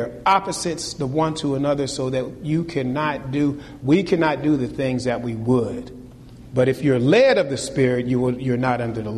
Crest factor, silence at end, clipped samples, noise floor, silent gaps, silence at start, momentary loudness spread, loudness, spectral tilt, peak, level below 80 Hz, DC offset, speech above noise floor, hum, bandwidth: 16 dB; 0 s; under 0.1%; -41 dBFS; none; 0 s; 8 LU; -21 LUFS; -6 dB/octave; -6 dBFS; -48 dBFS; under 0.1%; 21 dB; none; 13 kHz